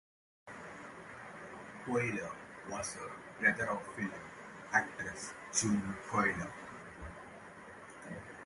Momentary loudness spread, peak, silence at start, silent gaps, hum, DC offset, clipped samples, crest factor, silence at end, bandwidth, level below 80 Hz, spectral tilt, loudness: 18 LU; -14 dBFS; 0.45 s; none; none; under 0.1%; under 0.1%; 24 dB; 0 s; 11.5 kHz; -64 dBFS; -4 dB/octave; -36 LUFS